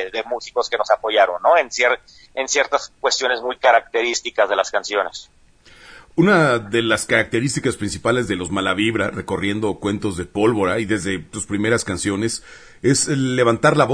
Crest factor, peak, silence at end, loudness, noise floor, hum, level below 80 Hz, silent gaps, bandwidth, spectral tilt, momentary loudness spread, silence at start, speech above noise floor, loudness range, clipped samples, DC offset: 18 dB; -2 dBFS; 0 s; -19 LUFS; -48 dBFS; none; -50 dBFS; none; 11 kHz; -4 dB/octave; 9 LU; 0 s; 29 dB; 3 LU; under 0.1%; under 0.1%